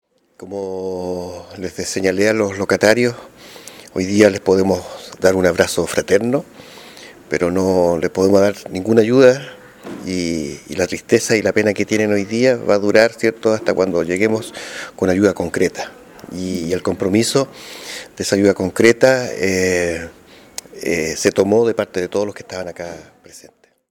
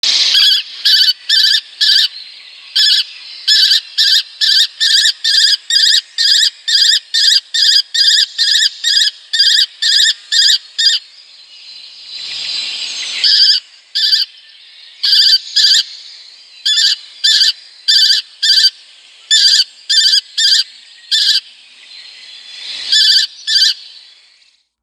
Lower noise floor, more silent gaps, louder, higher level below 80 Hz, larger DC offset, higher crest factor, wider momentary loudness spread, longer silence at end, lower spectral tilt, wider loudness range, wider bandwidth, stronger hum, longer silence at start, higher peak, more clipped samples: about the same, -49 dBFS vs -52 dBFS; neither; second, -17 LUFS vs -9 LUFS; first, -52 dBFS vs -70 dBFS; neither; about the same, 18 dB vs 14 dB; first, 18 LU vs 11 LU; second, 0.5 s vs 0.95 s; first, -5 dB/octave vs 6.5 dB/octave; about the same, 4 LU vs 4 LU; second, 18 kHz vs 20 kHz; neither; first, 0.4 s vs 0.05 s; about the same, 0 dBFS vs 0 dBFS; neither